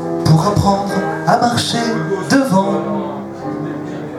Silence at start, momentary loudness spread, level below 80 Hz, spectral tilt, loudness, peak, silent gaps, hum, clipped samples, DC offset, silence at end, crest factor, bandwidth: 0 s; 11 LU; -44 dBFS; -5.5 dB/octave; -16 LUFS; 0 dBFS; none; none; under 0.1%; under 0.1%; 0 s; 16 dB; 13 kHz